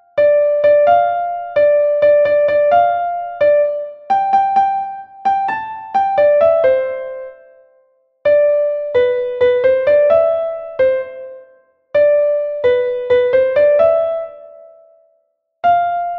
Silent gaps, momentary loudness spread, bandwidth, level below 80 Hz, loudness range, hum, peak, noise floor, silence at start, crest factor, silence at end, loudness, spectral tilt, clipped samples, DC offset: none; 11 LU; 4.9 kHz; -56 dBFS; 3 LU; none; -2 dBFS; -64 dBFS; 0.15 s; 12 dB; 0 s; -14 LUFS; -6 dB/octave; under 0.1%; under 0.1%